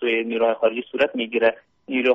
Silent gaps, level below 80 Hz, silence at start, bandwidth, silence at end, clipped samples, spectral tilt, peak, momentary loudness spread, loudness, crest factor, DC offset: none; -66 dBFS; 0 s; 6 kHz; 0 s; under 0.1%; -1 dB/octave; -6 dBFS; 4 LU; -22 LUFS; 16 dB; under 0.1%